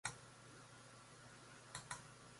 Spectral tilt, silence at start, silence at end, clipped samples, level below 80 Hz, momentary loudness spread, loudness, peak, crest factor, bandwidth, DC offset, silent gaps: -2 dB/octave; 0.05 s; 0 s; under 0.1%; -78 dBFS; 9 LU; -56 LUFS; -26 dBFS; 30 dB; 11.5 kHz; under 0.1%; none